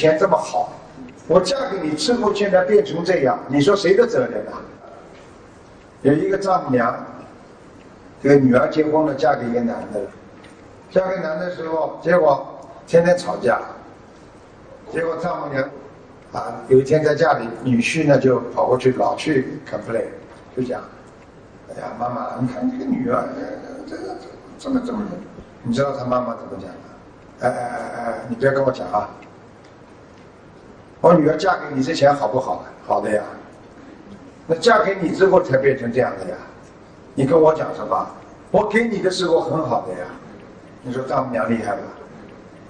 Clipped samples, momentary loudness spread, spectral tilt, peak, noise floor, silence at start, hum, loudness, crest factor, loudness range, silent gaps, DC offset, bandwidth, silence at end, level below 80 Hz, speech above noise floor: under 0.1%; 19 LU; -6 dB/octave; 0 dBFS; -44 dBFS; 0 s; none; -19 LUFS; 20 dB; 8 LU; none; under 0.1%; 10 kHz; 0.05 s; -52 dBFS; 26 dB